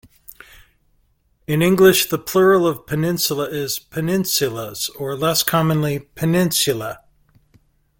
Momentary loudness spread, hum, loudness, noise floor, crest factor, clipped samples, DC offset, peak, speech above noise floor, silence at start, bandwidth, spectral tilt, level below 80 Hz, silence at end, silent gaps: 12 LU; none; -18 LUFS; -62 dBFS; 20 dB; under 0.1%; under 0.1%; 0 dBFS; 44 dB; 1.5 s; 17 kHz; -4.5 dB/octave; -52 dBFS; 1 s; none